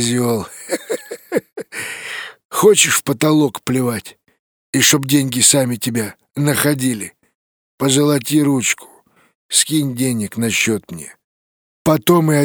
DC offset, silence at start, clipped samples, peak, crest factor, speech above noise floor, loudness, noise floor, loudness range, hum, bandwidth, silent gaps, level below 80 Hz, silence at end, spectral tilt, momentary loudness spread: under 0.1%; 0 s; under 0.1%; 0 dBFS; 18 dB; over 75 dB; -16 LUFS; under -90 dBFS; 3 LU; none; over 20 kHz; 2.45-2.49 s, 4.39-4.73 s, 7.35-7.78 s, 9.35-9.49 s, 11.24-11.85 s; -56 dBFS; 0 s; -3.5 dB/octave; 15 LU